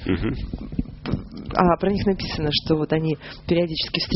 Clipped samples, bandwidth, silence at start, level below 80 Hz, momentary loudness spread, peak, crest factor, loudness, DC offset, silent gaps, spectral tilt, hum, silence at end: under 0.1%; 6 kHz; 0 s; -36 dBFS; 11 LU; -2 dBFS; 22 dB; -23 LUFS; under 0.1%; none; -4.5 dB/octave; none; 0 s